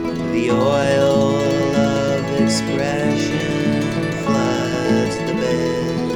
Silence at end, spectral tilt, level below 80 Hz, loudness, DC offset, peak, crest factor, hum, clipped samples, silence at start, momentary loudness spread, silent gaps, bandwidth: 0 s; -5.5 dB/octave; -44 dBFS; -18 LUFS; under 0.1%; -2 dBFS; 14 dB; none; under 0.1%; 0 s; 5 LU; none; 18 kHz